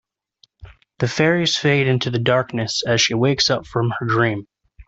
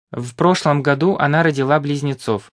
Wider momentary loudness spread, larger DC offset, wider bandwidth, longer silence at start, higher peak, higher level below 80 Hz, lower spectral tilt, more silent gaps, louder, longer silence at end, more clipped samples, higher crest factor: about the same, 6 LU vs 7 LU; neither; second, 8 kHz vs 11 kHz; first, 0.65 s vs 0.1 s; about the same, -4 dBFS vs -2 dBFS; first, -52 dBFS vs -58 dBFS; second, -4.5 dB/octave vs -6.5 dB/octave; neither; about the same, -18 LUFS vs -17 LUFS; about the same, 0.05 s vs 0.1 s; neither; about the same, 16 dB vs 16 dB